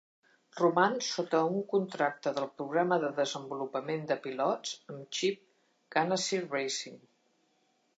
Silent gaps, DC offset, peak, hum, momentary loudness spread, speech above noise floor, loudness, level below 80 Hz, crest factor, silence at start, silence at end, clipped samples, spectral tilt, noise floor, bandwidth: none; under 0.1%; -12 dBFS; none; 9 LU; 42 dB; -32 LUFS; -88 dBFS; 22 dB; 0.55 s; 1 s; under 0.1%; -4 dB/octave; -73 dBFS; 9.2 kHz